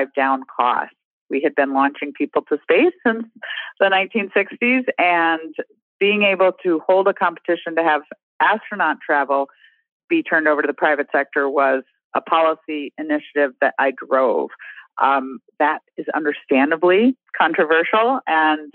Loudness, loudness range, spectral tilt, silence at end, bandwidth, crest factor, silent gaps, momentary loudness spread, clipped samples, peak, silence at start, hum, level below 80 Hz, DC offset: -19 LUFS; 2 LU; -7.5 dB/octave; 0.05 s; 4.3 kHz; 18 dB; 1.05-1.26 s, 5.82-6.00 s, 8.23-8.39 s, 9.92-10.08 s, 12.04-12.11 s; 11 LU; under 0.1%; 0 dBFS; 0 s; none; -76 dBFS; under 0.1%